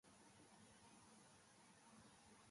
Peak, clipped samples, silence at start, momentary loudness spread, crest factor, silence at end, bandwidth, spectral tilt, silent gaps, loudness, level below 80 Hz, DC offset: -54 dBFS; under 0.1%; 0.05 s; 1 LU; 14 dB; 0 s; 11.5 kHz; -3 dB/octave; none; -68 LUFS; -88 dBFS; under 0.1%